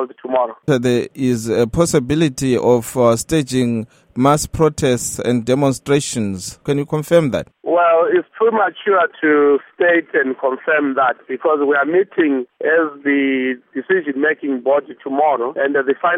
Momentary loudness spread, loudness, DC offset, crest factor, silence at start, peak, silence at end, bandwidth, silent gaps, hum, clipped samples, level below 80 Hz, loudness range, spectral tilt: 6 LU; -17 LUFS; under 0.1%; 16 dB; 0 s; 0 dBFS; 0 s; 16.5 kHz; none; none; under 0.1%; -46 dBFS; 2 LU; -5.5 dB/octave